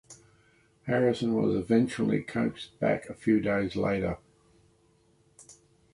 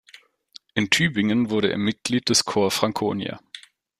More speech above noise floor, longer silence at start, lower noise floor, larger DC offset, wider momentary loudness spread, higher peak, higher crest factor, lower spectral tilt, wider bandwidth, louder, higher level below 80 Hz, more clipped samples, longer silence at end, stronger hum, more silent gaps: first, 38 dB vs 30 dB; second, 0.1 s vs 0.75 s; first, -65 dBFS vs -52 dBFS; neither; second, 6 LU vs 13 LU; second, -12 dBFS vs -2 dBFS; second, 16 dB vs 22 dB; first, -7 dB/octave vs -3.5 dB/octave; second, 11.5 kHz vs 15.5 kHz; second, -28 LUFS vs -22 LUFS; about the same, -56 dBFS vs -60 dBFS; neither; about the same, 0.4 s vs 0.4 s; neither; neither